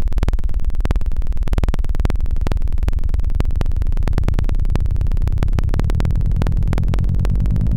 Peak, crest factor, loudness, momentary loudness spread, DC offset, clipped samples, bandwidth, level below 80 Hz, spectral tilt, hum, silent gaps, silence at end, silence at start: -6 dBFS; 10 dB; -21 LUFS; 3 LU; under 0.1%; under 0.1%; 8 kHz; -18 dBFS; -8 dB/octave; none; none; 0 s; 0 s